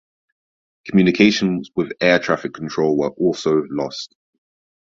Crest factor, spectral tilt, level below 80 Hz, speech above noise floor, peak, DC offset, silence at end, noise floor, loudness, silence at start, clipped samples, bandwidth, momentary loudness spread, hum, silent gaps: 18 dB; -5.5 dB/octave; -56 dBFS; over 72 dB; -2 dBFS; under 0.1%; 0.8 s; under -90 dBFS; -18 LUFS; 0.85 s; under 0.1%; 7.6 kHz; 12 LU; none; none